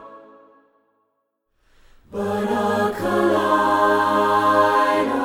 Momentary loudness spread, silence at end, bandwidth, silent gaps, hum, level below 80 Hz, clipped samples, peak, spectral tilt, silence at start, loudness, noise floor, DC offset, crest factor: 8 LU; 0 s; 17.5 kHz; none; none; -56 dBFS; under 0.1%; -4 dBFS; -5.5 dB/octave; 0 s; -19 LUFS; -72 dBFS; under 0.1%; 16 dB